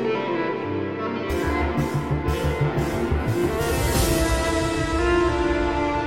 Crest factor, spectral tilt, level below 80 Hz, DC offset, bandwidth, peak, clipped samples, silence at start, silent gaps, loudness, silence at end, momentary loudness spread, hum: 14 dB; -5.5 dB/octave; -32 dBFS; 0.3%; 16.5 kHz; -8 dBFS; under 0.1%; 0 s; none; -23 LUFS; 0 s; 5 LU; none